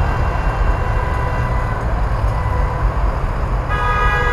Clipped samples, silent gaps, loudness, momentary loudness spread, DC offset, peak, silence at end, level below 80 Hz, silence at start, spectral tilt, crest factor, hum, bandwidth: under 0.1%; none; -19 LUFS; 4 LU; under 0.1%; -4 dBFS; 0 s; -18 dBFS; 0 s; -7 dB/octave; 14 dB; none; 11.5 kHz